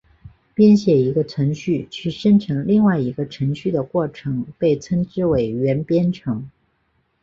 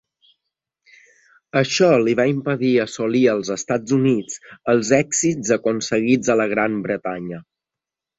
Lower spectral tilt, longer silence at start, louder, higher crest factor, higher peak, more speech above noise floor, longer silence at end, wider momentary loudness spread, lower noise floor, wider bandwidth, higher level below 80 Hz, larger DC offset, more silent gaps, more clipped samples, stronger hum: first, -8.5 dB/octave vs -4.5 dB/octave; second, 0.25 s vs 1.55 s; about the same, -19 LUFS vs -19 LUFS; about the same, 16 dB vs 18 dB; about the same, -4 dBFS vs -2 dBFS; second, 48 dB vs 68 dB; about the same, 0.75 s vs 0.75 s; about the same, 11 LU vs 9 LU; second, -66 dBFS vs -87 dBFS; about the same, 7.4 kHz vs 8 kHz; first, -50 dBFS vs -60 dBFS; neither; neither; neither; neither